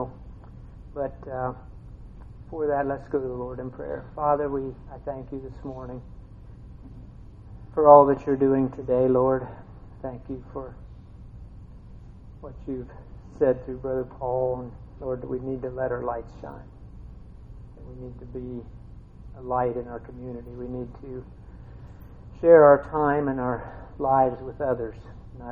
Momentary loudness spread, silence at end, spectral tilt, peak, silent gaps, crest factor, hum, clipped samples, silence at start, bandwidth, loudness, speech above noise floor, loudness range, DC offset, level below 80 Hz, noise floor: 25 LU; 0 s; -10.5 dB/octave; 0 dBFS; none; 26 dB; none; under 0.1%; 0 s; 4.5 kHz; -24 LUFS; 20 dB; 15 LU; under 0.1%; -46 dBFS; -44 dBFS